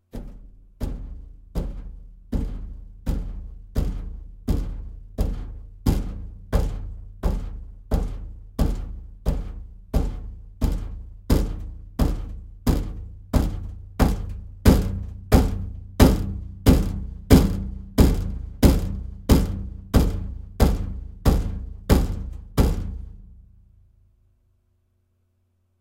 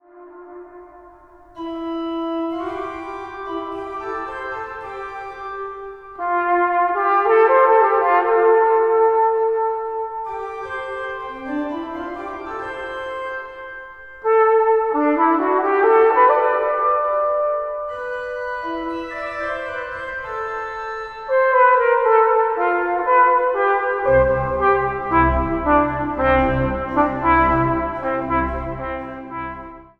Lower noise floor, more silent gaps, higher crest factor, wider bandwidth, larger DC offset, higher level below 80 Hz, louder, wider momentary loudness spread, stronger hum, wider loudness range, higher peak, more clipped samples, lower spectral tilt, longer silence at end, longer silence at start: first, -68 dBFS vs -46 dBFS; neither; about the same, 22 dB vs 18 dB; first, 17 kHz vs 6.2 kHz; neither; first, -26 dBFS vs -38 dBFS; second, -25 LUFS vs -19 LUFS; first, 19 LU vs 15 LU; neither; about the same, 11 LU vs 12 LU; about the same, -2 dBFS vs -2 dBFS; neither; about the same, -7 dB/octave vs -8 dB/octave; first, 2.4 s vs 0.15 s; about the same, 0.15 s vs 0.15 s